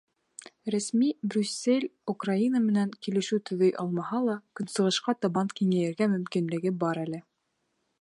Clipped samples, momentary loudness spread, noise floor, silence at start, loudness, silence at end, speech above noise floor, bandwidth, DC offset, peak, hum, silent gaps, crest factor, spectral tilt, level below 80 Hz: under 0.1%; 8 LU; -77 dBFS; 0.4 s; -28 LUFS; 0.8 s; 50 dB; 11.5 kHz; under 0.1%; -12 dBFS; none; none; 16 dB; -5.5 dB/octave; -78 dBFS